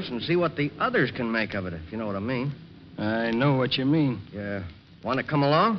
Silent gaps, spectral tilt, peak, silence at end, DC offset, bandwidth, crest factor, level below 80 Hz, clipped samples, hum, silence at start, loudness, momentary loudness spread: none; -4.5 dB/octave; -10 dBFS; 0 s; under 0.1%; 6 kHz; 16 dB; -56 dBFS; under 0.1%; none; 0 s; -26 LUFS; 11 LU